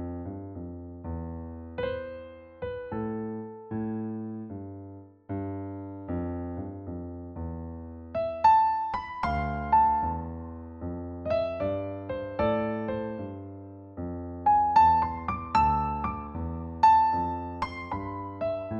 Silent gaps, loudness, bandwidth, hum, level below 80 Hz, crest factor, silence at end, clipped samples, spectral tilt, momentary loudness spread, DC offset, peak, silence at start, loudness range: none; -29 LUFS; 7.4 kHz; none; -46 dBFS; 20 dB; 0 s; under 0.1%; -8 dB/octave; 19 LU; under 0.1%; -10 dBFS; 0 s; 11 LU